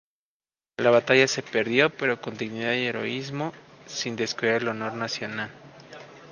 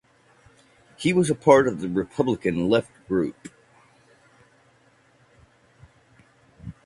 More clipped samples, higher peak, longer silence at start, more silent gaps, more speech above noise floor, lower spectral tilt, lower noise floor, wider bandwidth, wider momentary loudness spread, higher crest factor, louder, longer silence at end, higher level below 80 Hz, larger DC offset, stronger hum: neither; about the same, -4 dBFS vs -2 dBFS; second, 0.8 s vs 1 s; neither; first, over 65 dB vs 38 dB; second, -4 dB/octave vs -6 dB/octave; first, under -90 dBFS vs -60 dBFS; second, 10 kHz vs 11.5 kHz; second, 16 LU vs 26 LU; about the same, 24 dB vs 24 dB; second, -25 LUFS vs -22 LUFS; second, 0 s vs 0.15 s; second, -70 dBFS vs -56 dBFS; neither; neither